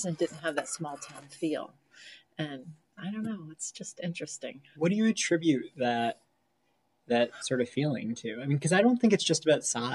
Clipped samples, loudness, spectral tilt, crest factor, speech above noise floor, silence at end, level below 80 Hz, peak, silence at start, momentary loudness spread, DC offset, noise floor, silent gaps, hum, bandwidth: under 0.1%; -30 LUFS; -4.5 dB/octave; 20 dB; 45 dB; 0 s; -78 dBFS; -10 dBFS; 0 s; 18 LU; under 0.1%; -74 dBFS; none; none; 12 kHz